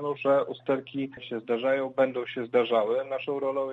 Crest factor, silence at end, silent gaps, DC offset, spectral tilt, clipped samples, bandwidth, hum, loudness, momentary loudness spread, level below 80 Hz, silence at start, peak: 18 dB; 0 s; none; under 0.1%; -7.5 dB/octave; under 0.1%; 4.2 kHz; none; -28 LUFS; 9 LU; -76 dBFS; 0 s; -10 dBFS